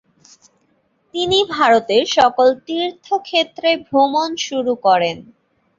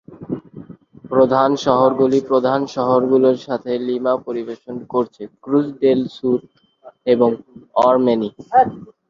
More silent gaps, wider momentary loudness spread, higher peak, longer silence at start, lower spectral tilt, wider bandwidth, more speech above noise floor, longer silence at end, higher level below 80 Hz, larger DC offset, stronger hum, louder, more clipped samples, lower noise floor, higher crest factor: neither; second, 9 LU vs 13 LU; about the same, -2 dBFS vs -2 dBFS; first, 1.15 s vs 0.1 s; second, -3 dB/octave vs -7 dB/octave; about the same, 7.8 kHz vs 7.4 kHz; first, 46 dB vs 23 dB; first, 0.55 s vs 0.25 s; about the same, -58 dBFS vs -60 dBFS; neither; neither; about the same, -16 LUFS vs -17 LUFS; neither; first, -62 dBFS vs -40 dBFS; about the same, 16 dB vs 16 dB